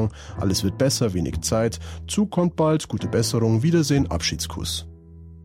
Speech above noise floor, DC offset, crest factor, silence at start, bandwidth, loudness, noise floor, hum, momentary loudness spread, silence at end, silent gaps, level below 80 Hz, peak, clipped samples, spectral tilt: 21 dB; under 0.1%; 14 dB; 0 s; 16 kHz; -23 LUFS; -43 dBFS; none; 8 LU; 0 s; none; -40 dBFS; -8 dBFS; under 0.1%; -5 dB/octave